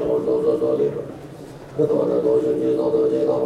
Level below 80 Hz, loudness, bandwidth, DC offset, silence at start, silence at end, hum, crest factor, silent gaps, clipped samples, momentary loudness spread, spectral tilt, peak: -56 dBFS; -20 LUFS; 10 kHz; under 0.1%; 0 s; 0 s; none; 12 dB; none; under 0.1%; 16 LU; -8.5 dB/octave; -8 dBFS